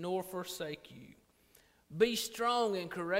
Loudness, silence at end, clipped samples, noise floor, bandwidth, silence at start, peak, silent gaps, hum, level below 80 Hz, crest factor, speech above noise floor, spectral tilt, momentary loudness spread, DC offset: -35 LUFS; 0 s; under 0.1%; -67 dBFS; 16 kHz; 0 s; -16 dBFS; none; none; -70 dBFS; 20 dB; 32 dB; -3.5 dB/octave; 18 LU; under 0.1%